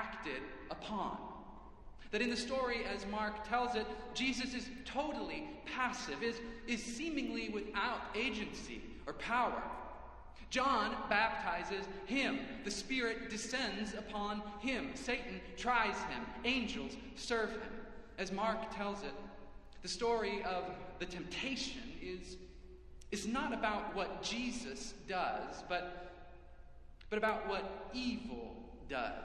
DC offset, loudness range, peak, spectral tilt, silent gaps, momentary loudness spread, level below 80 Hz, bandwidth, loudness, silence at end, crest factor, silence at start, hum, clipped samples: under 0.1%; 4 LU; -18 dBFS; -3.5 dB/octave; none; 13 LU; -58 dBFS; 12 kHz; -39 LUFS; 0 s; 22 dB; 0 s; none; under 0.1%